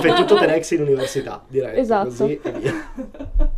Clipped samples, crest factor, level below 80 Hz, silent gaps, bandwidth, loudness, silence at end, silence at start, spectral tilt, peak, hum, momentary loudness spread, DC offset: under 0.1%; 16 dB; -28 dBFS; none; 14 kHz; -20 LUFS; 0 s; 0 s; -5 dB/octave; -2 dBFS; none; 14 LU; under 0.1%